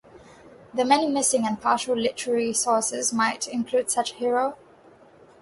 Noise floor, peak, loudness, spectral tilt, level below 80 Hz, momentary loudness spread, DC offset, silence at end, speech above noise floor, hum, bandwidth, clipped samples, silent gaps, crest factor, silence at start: -52 dBFS; -4 dBFS; -24 LUFS; -2 dB/octave; -66 dBFS; 5 LU; under 0.1%; 0.85 s; 29 dB; none; 12 kHz; under 0.1%; none; 20 dB; 0.15 s